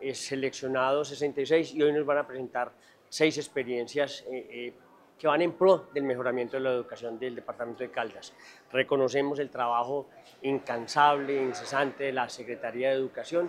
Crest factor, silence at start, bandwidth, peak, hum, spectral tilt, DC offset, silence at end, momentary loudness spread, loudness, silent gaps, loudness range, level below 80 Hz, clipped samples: 22 dB; 0 s; 13.5 kHz; -8 dBFS; none; -4.5 dB/octave; under 0.1%; 0 s; 14 LU; -29 LUFS; none; 3 LU; -80 dBFS; under 0.1%